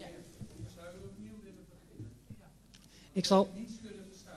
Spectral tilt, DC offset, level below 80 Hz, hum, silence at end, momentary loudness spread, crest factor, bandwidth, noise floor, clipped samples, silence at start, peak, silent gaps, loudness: -5.5 dB/octave; under 0.1%; -62 dBFS; none; 0 s; 27 LU; 24 dB; 13 kHz; -59 dBFS; under 0.1%; 0 s; -14 dBFS; none; -32 LUFS